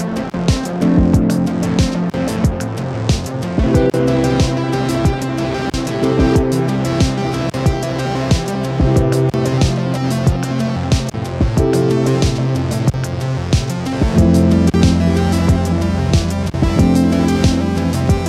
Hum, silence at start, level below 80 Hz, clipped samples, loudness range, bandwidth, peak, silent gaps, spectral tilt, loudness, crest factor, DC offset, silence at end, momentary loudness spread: none; 0 s; -26 dBFS; under 0.1%; 2 LU; 14.5 kHz; 0 dBFS; none; -6.5 dB/octave; -16 LUFS; 14 dB; under 0.1%; 0 s; 7 LU